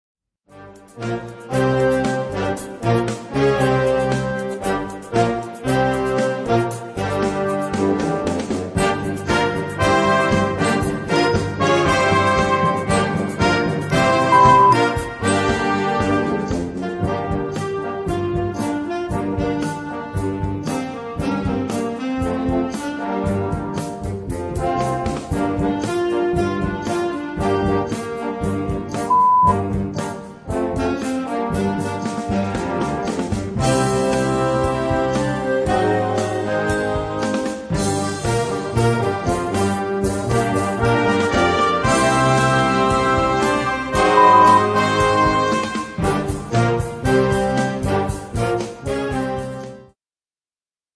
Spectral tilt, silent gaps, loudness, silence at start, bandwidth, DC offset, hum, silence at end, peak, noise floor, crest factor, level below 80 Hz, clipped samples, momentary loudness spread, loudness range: -5.5 dB/octave; none; -19 LUFS; 0.55 s; 11 kHz; under 0.1%; none; 1.1 s; -2 dBFS; under -90 dBFS; 18 dB; -38 dBFS; under 0.1%; 9 LU; 8 LU